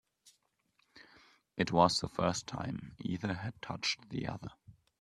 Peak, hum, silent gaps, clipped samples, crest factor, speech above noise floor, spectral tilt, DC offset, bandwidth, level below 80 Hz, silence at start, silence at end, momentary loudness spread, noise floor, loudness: -12 dBFS; none; none; under 0.1%; 26 dB; 41 dB; -4.5 dB/octave; under 0.1%; 12.5 kHz; -64 dBFS; 0.95 s; 0.3 s; 14 LU; -76 dBFS; -35 LUFS